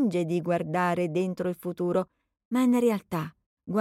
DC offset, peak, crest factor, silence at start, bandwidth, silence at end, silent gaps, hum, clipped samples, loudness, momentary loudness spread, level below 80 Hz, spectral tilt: under 0.1%; -12 dBFS; 14 dB; 0 s; 15.5 kHz; 0 s; 2.45-2.51 s, 3.46-3.57 s; none; under 0.1%; -28 LUFS; 10 LU; -68 dBFS; -7 dB/octave